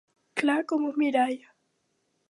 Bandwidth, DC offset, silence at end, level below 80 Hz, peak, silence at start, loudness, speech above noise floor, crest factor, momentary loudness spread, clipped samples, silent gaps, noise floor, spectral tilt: 11.5 kHz; under 0.1%; 0.95 s; -84 dBFS; -12 dBFS; 0.35 s; -27 LUFS; 49 dB; 18 dB; 8 LU; under 0.1%; none; -74 dBFS; -4 dB/octave